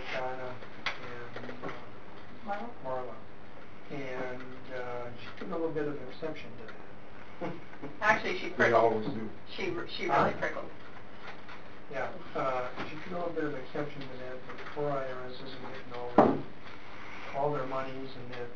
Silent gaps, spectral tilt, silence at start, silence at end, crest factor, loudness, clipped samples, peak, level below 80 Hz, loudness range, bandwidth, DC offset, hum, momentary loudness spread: none; -6 dB/octave; 0 s; 0 s; 28 dB; -34 LUFS; under 0.1%; -8 dBFS; -64 dBFS; 11 LU; 7.2 kHz; 2%; none; 19 LU